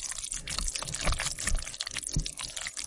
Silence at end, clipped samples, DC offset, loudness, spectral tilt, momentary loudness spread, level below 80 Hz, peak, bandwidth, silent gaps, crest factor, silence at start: 0 s; under 0.1%; under 0.1%; -33 LUFS; -1.5 dB/octave; 4 LU; -38 dBFS; -10 dBFS; 11.5 kHz; none; 24 dB; 0 s